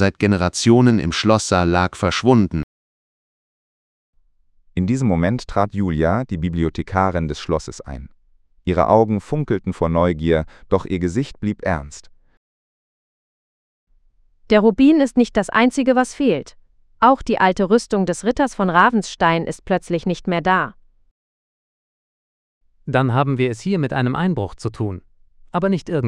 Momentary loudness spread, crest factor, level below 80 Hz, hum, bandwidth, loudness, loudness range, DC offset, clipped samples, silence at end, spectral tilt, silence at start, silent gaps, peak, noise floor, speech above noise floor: 10 LU; 20 dB; -42 dBFS; none; 11.5 kHz; -18 LUFS; 7 LU; under 0.1%; under 0.1%; 0 s; -6 dB/octave; 0 s; 2.63-4.13 s, 12.37-13.87 s, 21.11-22.61 s; 0 dBFS; -56 dBFS; 39 dB